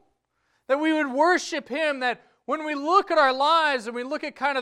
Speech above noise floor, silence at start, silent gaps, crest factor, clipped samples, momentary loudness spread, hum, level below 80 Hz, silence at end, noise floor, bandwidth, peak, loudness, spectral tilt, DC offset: 49 dB; 0.7 s; none; 18 dB; under 0.1%; 11 LU; none; -70 dBFS; 0 s; -72 dBFS; 12 kHz; -6 dBFS; -23 LUFS; -2 dB/octave; under 0.1%